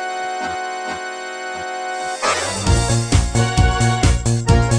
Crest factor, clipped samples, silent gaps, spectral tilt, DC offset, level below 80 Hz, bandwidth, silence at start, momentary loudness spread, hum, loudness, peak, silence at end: 18 dB; under 0.1%; none; -4.5 dB/octave; under 0.1%; -24 dBFS; 10 kHz; 0 s; 10 LU; none; -19 LUFS; 0 dBFS; 0 s